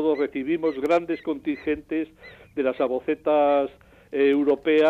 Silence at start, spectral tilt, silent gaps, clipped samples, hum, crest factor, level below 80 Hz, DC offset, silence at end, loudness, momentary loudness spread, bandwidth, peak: 0 s; -6.5 dB/octave; none; under 0.1%; none; 12 dB; -58 dBFS; under 0.1%; 0 s; -24 LUFS; 10 LU; 8 kHz; -10 dBFS